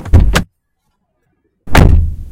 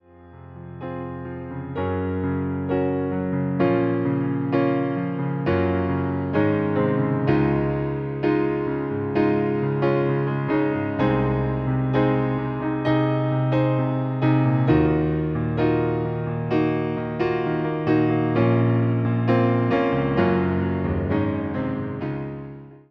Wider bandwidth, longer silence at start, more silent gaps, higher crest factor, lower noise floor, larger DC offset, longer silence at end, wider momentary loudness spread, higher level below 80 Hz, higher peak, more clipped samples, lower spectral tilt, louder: first, 17 kHz vs 5.6 kHz; second, 0 s vs 0.2 s; neither; about the same, 12 dB vs 16 dB; first, -65 dBFS vs -45 dBFS; neither; about the same, 0 s vs 0.1 s; about the same, 8 LU vs 7 LU; first, -14 dBFS vs -44 dBFS; first, 0 dBFS vs -6 dBFS; first, 3% vs under 0.1%; second, -6 dB/octave vs -10.5 dB/octave; first, -12 LUFS vs -23 LUFS